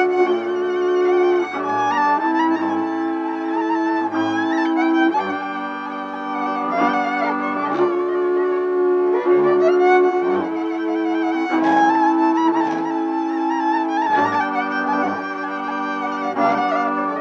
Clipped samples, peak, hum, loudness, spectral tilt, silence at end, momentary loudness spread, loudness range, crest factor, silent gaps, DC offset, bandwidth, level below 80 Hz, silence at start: under 0.1%; -4 dBFS; none; -19 LUFS; -5.5 dB/octave; 0 s; 8 LU; 3 LU; 14 dB; none; under 0.1%; 6.8 kHz; -72 dBFS; 0 s